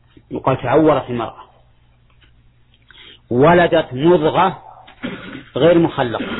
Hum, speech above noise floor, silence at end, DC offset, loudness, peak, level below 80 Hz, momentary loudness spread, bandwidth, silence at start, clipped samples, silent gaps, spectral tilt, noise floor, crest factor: 60 Hz at -45 dBFS; 37 dB; 0 s; under 0.1%; -15 LUFS; -2 dBFS; -46 dBFS; 17 LU; 4.1 kHz; 0.3 s; under 0.1%; none; -10.5 dB/octave; -52 dBFS; 16 dB